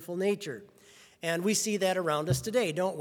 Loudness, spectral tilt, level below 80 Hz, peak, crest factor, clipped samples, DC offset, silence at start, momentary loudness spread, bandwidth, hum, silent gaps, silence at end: -30 LUFS; -4 dB/octave; -62 dBFS; -14 dBFS; 16 dB; under 0.1%; under 0.1%; 0 s; 9 LU; over 20 kHz; none; none; 0 s